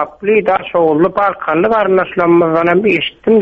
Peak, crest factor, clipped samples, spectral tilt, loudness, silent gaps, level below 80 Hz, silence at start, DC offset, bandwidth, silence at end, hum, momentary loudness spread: 0 dBFS; 12 dB; under 0.1%; -8 dB/octave; -12 LUFS; none; -48 dBFS; 0 s; under 0.1%; 5.2 kHz; 0 s; none; 4 LU